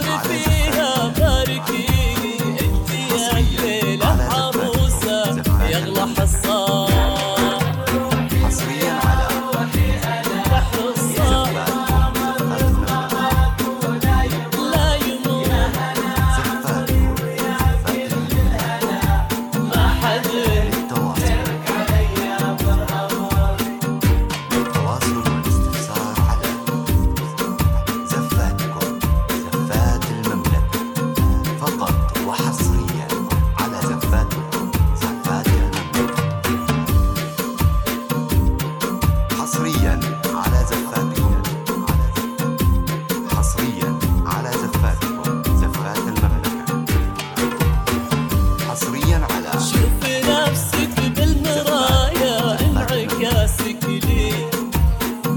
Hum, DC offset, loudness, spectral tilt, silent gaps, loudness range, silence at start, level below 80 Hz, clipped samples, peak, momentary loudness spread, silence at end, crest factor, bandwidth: none; 0.1%; -19 LUFS; -5 dB/octave; none; 2 LU; 0 s; -24 dBFS; under 0.1%; -2 dBFS; 4 LU; 0 s; 16 dB; 19 kHz